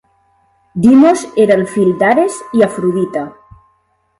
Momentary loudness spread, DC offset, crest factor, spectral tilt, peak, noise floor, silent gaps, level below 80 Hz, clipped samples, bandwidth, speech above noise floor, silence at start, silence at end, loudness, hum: 12 LU; under 0.1%; 12 dB; -6.5 dB/octave; 0 dBFS; -59 dBFS; none; -52 dBFS; under 0.1%; 11.5 kHz; 48 dB; 0.75 s; 0.9 s; -12 LUFS; none